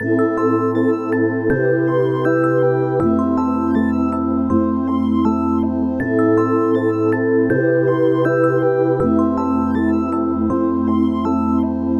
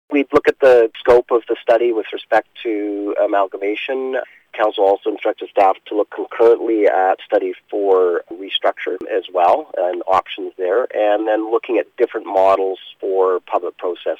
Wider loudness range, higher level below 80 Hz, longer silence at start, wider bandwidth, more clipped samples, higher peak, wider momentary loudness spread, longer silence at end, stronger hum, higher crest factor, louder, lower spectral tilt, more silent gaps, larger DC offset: about the same, 1 LU vs 3 LU; first, -44 dBFS vs -56 dBFS; about the same, 0 s vs 0.1 s; second, 7 kHz vs 7.8 kHz; neither; about the same, -4 dBFS vs -4 dBFS; second, 3 LU vs 10 LU; about the same, 0 s vs 0.05 s; neither; about the same, 12 dB vs 14 dB; about the same, -17 LUFS vs -17 LUFS; first, -9.5 dB/octave vs -5 dB/octave; neither; neither